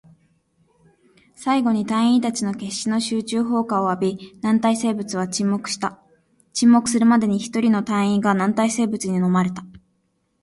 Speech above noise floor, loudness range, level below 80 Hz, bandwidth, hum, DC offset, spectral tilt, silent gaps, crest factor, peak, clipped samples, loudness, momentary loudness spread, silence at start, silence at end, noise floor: 49 dB; 4 LU; -62 dBFS; 11.5 kHz; none; under 0.1%; -5 dB/octave; none; 16 dB; -4 dBFS; under 0.1%; -20 LUFS; 9 LU; 1.4 s; 0.65 s; -68 dBFS